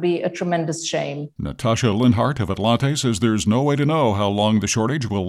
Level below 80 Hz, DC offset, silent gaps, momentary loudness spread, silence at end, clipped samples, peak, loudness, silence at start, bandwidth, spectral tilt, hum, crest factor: -48 dBFS; under 0.1%; none; 7 LU; 0 s; under 0.1%; -6 dBFS; -20 LUFS; 0 s; 14 kHz; -5.5 dB/octave; none; 14 dB